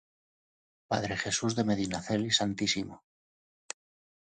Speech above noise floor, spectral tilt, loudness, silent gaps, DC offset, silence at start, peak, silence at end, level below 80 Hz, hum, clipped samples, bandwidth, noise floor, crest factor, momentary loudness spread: over 59 dB; -3.5 dB/octave; -30 LUFS; none; under 0.1%; 0.9 s; -12 dBFS; 1.25 s; -60 dBFS; none; under 0.1%; 9.6 kHz; under -90 dBFS; 22 dB; 18 LU